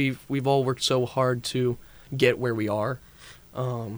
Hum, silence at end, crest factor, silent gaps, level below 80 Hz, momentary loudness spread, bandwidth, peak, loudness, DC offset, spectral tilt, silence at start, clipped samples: none; 0 s; 18 dB; none; -56 dBFS; 12 LU; over 20 kHz; -8 dBFS; -26 LUFS; under 0.1%; -5.5 dB/octave; 0 s; under 0.1%